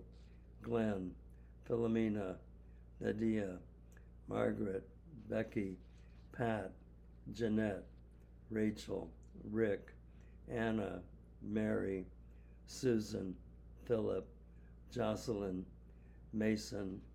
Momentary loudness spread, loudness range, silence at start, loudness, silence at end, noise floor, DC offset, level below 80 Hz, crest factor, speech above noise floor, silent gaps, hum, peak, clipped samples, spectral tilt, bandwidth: 23 LU; 2 LU; 0 s; -40 LUFS; 0 s; -59 dBFS; under 0.1%; -58 dBFS; 20 dB; 20 dB; none; none; -22 dBFS; under 0.1%; -7 dB/octave; 14 kHz